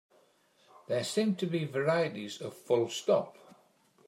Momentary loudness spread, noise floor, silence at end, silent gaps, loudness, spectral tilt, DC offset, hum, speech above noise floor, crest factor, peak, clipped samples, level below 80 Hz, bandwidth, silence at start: 11 LU; -67 dBFS; 0.75 s; none; -32 LUFS; -5 dB/octave; under 0.1%; none; 36 dB; 18 dB; -16 dBFS; under 0.1%; -82 dBFS; 16 kHz; 0.9 s